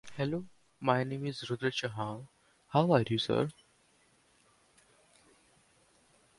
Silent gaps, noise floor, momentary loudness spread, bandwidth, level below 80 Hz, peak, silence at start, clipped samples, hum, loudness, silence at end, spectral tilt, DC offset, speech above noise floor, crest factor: none; -68 dBFS; 12 LU; 11.5 kHz; -68 dBFS; -12 dBFS; 0.05 s; under 0.1%; none; -33 LUFS; 2.85 s; -6.5 dB/octave; under 0.1%; 37 dB; 24 dB